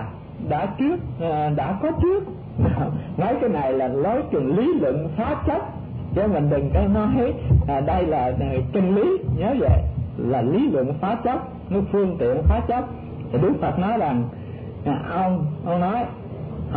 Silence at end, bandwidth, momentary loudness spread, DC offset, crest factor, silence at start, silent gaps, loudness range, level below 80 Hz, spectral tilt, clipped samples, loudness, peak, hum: 0 s; 4.5 kHz; 8 LU; under 0.1%; 16 dB; 0 s; none; 3 LU; -32 dBFS; -12.5 dB/octave; under 0.1%; -22 LUFS; -6 dBFS; none